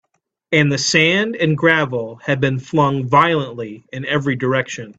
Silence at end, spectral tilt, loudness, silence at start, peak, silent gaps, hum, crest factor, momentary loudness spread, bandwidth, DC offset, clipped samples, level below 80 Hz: 0.05 s; -5 dB/octave; -16 LUFS; 0.5 s; 0 dBFS; none; none; 18 dB; 10 LU; 8.4 kHz; under 0.1%; under 0.1%; -56 dBFS